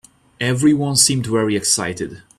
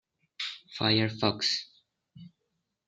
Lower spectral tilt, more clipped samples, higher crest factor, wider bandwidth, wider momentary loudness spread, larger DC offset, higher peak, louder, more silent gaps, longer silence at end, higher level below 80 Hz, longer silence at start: about the same, -3.5 dB/octave vs -4.5 dB/octave; neither; about the same, 18 dB vs 22 dB; first, 15 kHz vs 9.2 kHz; about the same, 10 LU vs 11 LU; neither; first, 0 dBFS vs -10 dBFS; first, -16 LUFS vs -29 LUFS; neither; second, 0.2 s vs 0.6 s; first, -52 dBFS vs -70 dBFS; about the same, 0.4 s vs 0.4 s